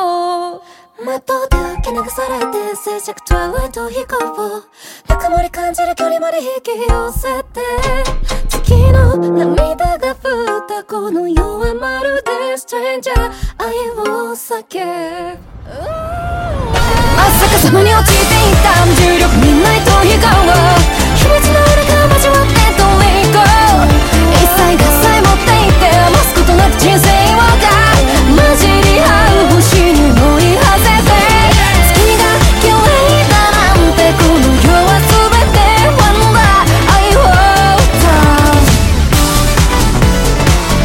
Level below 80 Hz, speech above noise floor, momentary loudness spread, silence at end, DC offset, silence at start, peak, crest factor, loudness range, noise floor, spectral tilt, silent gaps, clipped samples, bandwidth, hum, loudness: -16 dBFS; 22 dB; 12 LU; 0 s; under 0.1%; 0 s; 0 dBFS; 10 dB; 11 LU; -33 dBFS; -4.5 dB/octave; none; under 0.1%; 17.5 kHz; none; -9 LUFS